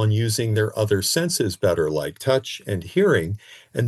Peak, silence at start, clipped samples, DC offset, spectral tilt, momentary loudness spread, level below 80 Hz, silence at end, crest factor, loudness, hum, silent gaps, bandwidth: -6 dBFS; 0 s; under 0.1%; under 0.1%; -5 dB/octave; 9 LU; -56 dBFS; 0 s; 16 dB; -22 LUFS; none; none; 12.5 kHz